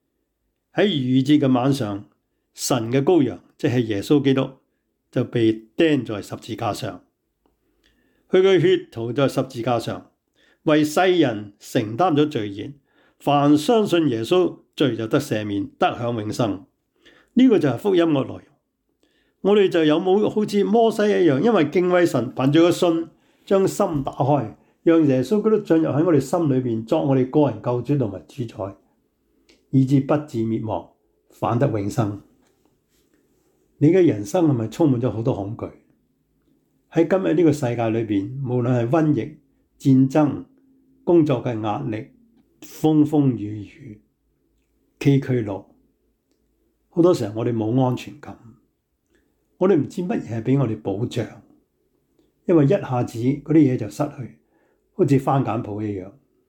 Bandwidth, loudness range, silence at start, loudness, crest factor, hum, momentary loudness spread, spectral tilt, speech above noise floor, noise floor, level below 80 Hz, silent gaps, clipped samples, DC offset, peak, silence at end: 19 kHz; 5 LU; 0.75 s; -20 LUFS; 14 dB; none; 13 LU; -7 dB/octave; 54 dB; -74 dBFS; -60 dBFS; none; under 0.1%; under 0.1%; -6 dBFS; 0.4 s